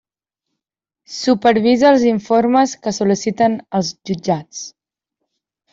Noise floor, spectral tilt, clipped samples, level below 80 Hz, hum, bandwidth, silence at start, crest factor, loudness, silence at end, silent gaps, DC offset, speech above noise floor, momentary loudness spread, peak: -84 dBFS; -5 dB/octave; under 0.1%; -58 dBFS; none; 7.8 kHz; 1.1 s; 14 dB; -16 LUFS; 1.05 s; none; under 0.1%; 68 dB; 13 LU; -2 dBFS